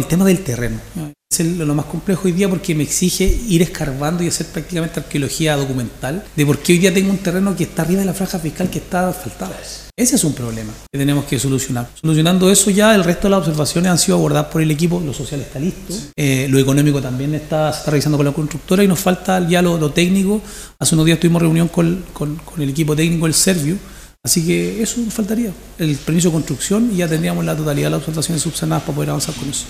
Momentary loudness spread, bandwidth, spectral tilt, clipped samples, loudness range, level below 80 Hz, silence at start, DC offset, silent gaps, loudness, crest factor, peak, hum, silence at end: 10 LU; 16 kHz; -5 dB/octave; under 0.1%; 5 LU; -34 dBFS; 0 s; under 0.1%; none; -17 LUFS; 16 dB; 0 dBFS; none; 0 s